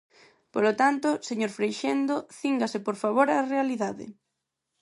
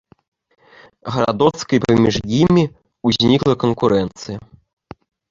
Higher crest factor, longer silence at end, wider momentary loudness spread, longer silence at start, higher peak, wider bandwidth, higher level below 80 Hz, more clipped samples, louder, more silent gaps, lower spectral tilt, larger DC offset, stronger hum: about the same, 20 dB vs 16 dB; second, 0.7 s vs 0.9 s; second, 9 LU vs 14 LU; second, 0.55 s vs 1.05 s; second, -8 dBFS vs -2 dBFS; first, 11.5 kHz vs 7.6 kHz; second, -76 dBFS vs -44 dBFS; neither; second, -27 LUFS vs -17 LUFS; neither; second, -4.5 dB/octave vs -6.5 dB/octave; neither; neither